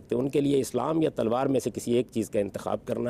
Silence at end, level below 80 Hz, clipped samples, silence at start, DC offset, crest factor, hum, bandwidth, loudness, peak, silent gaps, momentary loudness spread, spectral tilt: 0 s; -58 dBFS; under 0.1%; 0 s; under 0.1%; 12 dB; none; 15.5 kHz; -27 LUFS; -14 dBFS; none; 5 LU; -6.5 dB/octave